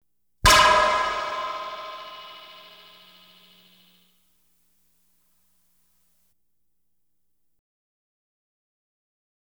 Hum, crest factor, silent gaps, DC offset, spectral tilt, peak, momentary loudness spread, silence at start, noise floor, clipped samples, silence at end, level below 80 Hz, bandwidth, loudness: none; 26 dB; none; under 0.1%; -1.5 dB/octave; -2 dBFS; 28 LU; 0.45 s; -79 dBFS; under 0.1%; 7.15 s; -42 dBFS; over 20 kHz; -20 LUFS